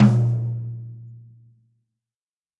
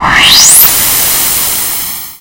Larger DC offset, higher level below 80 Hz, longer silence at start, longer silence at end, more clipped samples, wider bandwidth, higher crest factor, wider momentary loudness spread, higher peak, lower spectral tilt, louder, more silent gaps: neither; second, -60 dBFS vs -32 dBFS; about the same, 0 s vs 0 s; first, 1.4 s vs 0.05 s; second, under 0.1% vs 5%; second, 6.4 kHz vs over 20 kHz; first, 20 dB vs 8 dB; first, 23 LU vs 12 LU; second, -4 dBFS vs 0 dBFS; first, -9.5 dB/octave vs 0.5 dB/octave; second, -23 LUFS vs -4 LUFS; neither